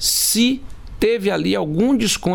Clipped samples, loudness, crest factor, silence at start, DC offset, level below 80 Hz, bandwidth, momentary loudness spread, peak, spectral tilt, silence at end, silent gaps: under 0.1%; -18 LUFS; 14 dB; 0 s; under 0.1%; -38 dBFS; 18 kHz; 5 LU; -6 dBFS; -3.5 dB/octave; 0 s; none